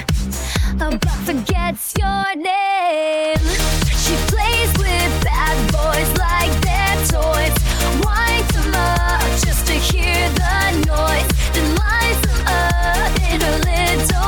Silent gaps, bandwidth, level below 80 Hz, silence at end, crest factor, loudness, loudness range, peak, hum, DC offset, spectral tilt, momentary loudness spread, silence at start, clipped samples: none; 19 kHz; -20 dBFS; 0 s; 12 dB; -17 LUFS; 2 LU; -4 dBFS; none; under 0.1%; -4 dB/octave; 4 LU; 0 s; under 0.1%